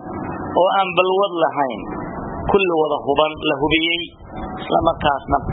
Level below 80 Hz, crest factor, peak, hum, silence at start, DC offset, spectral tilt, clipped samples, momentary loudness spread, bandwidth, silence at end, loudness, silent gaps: -40 dBFS; 20 dB; 0 dBFS; none; 0 s; under 0.1%; -9.5 dB/octave; under 0.1%; 12 LU; 4 kHz; 0 s; -19 LUFS; none